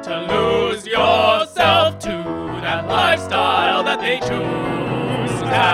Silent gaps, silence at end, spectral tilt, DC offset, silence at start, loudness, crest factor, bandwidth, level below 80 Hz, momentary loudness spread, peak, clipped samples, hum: none; 0 s; -4.5 dB/octave; under 0.1%; 0 s; -17 LUFS; 16 dB; 14.5 kHz; -46 dBFS; 8 LU; -2 dBFS; under 0.1%; none